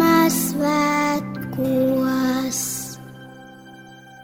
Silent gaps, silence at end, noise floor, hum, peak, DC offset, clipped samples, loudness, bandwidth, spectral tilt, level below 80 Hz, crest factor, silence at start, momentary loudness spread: none; 0 s; -43 dBFS; none; -4 dBFS; under 0.1%; under 0.1%; -20 LUFS; 19 kHz; -4.5 dB/octave; -54 dBFS; 18 dB; 0 s; 21 LU